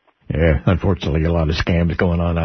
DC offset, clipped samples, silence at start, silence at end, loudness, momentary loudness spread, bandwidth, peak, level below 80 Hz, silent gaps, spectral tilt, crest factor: under 0.1%; under 0.1%; 0.3 s; 0 s; -18 LUFS; 3 LU; 6.4 kHz; -2 dBFS; -26 dBFS; none; -8 dB/octave; 14 dB